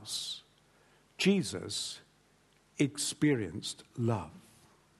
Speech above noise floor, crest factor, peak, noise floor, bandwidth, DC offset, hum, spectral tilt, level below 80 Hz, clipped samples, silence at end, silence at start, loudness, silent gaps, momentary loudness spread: 35 dB; 20 dB; -14 dBFS; -67 dBFS; 12.5 kHz; under 0.1%; 50 Hz at -60 dBFS; -4.5 dB/octave; -68 dBFS; under 0.1%; 0.6 s; 0 s; -33 LUFS; none; 14 LU